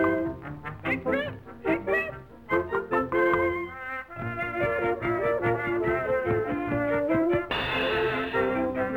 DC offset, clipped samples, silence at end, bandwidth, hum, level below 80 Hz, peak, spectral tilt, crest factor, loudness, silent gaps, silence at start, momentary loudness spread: under 0.1%; under 0.1%; 0 s; 16.5 kHz; none; -50 dBFS; -12 dBFS; -7.5 dB/octave; 14 dB; -27 LUFS; none; 0 s; 10 LU